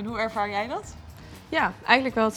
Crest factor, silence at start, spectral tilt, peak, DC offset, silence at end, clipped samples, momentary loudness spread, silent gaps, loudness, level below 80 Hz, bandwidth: 24 dB; 0 s; -4.5 dB/octave; -2 dBFS; under 0.1%; 0 s; under 0.1%; 24 LU; none; -25 LUFS; -52 dBFS; 19 kHz